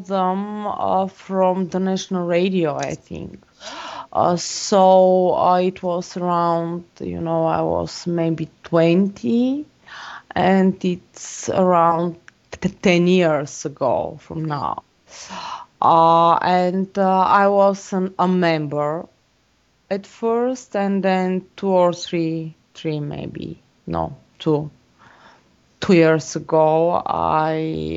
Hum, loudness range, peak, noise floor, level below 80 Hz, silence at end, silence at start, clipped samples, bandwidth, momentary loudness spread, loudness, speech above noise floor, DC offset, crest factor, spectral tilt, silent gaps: none; 6 LU; -2 dBFS; -61 dBFS; -54 dBFS; 0 s; 0 s; under 0.1%; 8 kHz; 17 LU; -19 LUFS; 43 dB; under 0.1%; 18 dB; -6 dB/octave; none